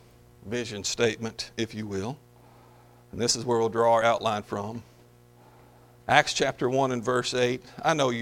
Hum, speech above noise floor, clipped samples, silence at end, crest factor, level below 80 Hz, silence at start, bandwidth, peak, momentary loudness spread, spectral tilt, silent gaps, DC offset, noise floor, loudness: 60 Hz at -55 dBFS; 29 dB; under 0.1%; 0 s; 26 dB; -60 dBFS; 0.45 s; 16.5 kHz; -2 dBFS; 13 LU; -3.5 dB/octave; none; under 0.1%; -55 dBFS; -26 LUFS